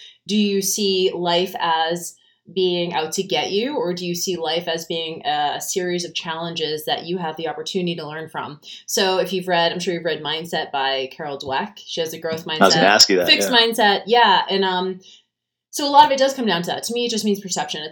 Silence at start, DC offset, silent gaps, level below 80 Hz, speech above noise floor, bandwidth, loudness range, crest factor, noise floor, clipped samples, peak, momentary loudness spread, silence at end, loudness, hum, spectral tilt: 0 s; under 0.1%; none; -68 dBFS; 57 dB; 19.5 kHz; 8 LU; 20 dB; -77 dBFS; under 0.1%; 0 dBFS; 13 LU; 0 s; -19 LUFS; none; -3 dB/octave